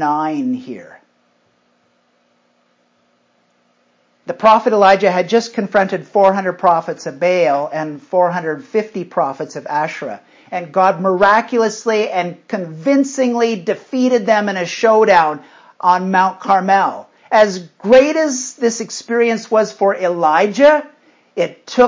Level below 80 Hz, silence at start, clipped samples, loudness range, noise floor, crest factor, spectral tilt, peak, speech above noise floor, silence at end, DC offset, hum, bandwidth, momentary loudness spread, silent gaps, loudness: -60 dBFS; 0 s; under 0.1%; 5 LU; -60 dBFS; 16 dB; -4.5 dB/octave; 0 dBFS; 45 dB; 0 s; under 0.1%; none; 7.6 kHz; 13 LU; none; -15 LUFS